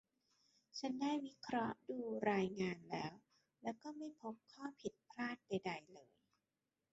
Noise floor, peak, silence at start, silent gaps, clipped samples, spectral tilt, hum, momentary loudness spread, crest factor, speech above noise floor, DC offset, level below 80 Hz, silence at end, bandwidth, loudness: under -90 dBFS; -26 dBFS; 0.75 s; none; under 0.1%; -4.5 dB/octave; none; 13 LU; 20 dB; over 46 dB; under 0.1%; -80 dBFS; 0.9 s; 8 kHz; -45 LUFS